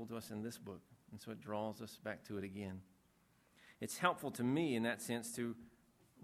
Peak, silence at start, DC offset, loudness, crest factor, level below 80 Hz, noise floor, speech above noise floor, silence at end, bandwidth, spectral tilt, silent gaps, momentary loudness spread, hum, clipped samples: -16 dBFS; 0 s; under 0.1%; -42 LUFS; 26 dB; -78 dBFS; -73 dBFS; 31 dB; 0 s; 15.5 kHz; -5 dB/octave; none; 17 LU; none; under 0.1%